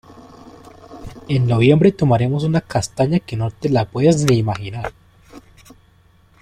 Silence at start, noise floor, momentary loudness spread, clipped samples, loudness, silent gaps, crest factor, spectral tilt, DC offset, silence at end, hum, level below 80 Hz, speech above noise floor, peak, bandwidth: 0.9 s; -53 dBFS; 16 LU; under 0.1%; -17 LUFS; none; 18 dB; -7 dB/octave; under 0.1%; 1 s; none; -46 dBFS; 36 dB; 0 dBFS; 13 kHz